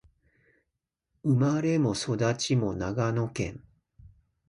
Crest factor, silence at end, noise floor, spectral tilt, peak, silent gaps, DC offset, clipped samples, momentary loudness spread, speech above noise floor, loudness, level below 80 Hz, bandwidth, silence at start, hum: 16 dB; 0.9 s; -84 dBFS; -6 dB/octave; -14 dBFS; none; under 0.1%; under 0.1%; 8 LU; 57 dB; -28 LUFS; -54 dBFS; 11 kHz; 1.25 s; none